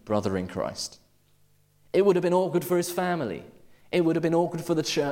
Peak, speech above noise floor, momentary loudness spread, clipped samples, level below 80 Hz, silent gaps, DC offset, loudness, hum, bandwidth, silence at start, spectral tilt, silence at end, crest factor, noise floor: -10 dBFS; 37 dB; 10 LU; under 0.1%; -62 dBFS; none; under 0.1%; -26 LUFS; none; 17 kHz; 0.05 s; -5.5 dB/octave; 0 s; 16 dB; -62 dBFS